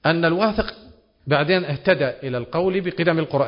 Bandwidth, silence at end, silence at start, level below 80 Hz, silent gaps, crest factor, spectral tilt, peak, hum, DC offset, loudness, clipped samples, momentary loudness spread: 5.4 kHz; 0 s; 0.05 s; -46 dBFS; none; 18 dB; -11 dB/octave; -4 dBFS; none; under 0.1%; -21 LUFS; under 0.1%; 8 LU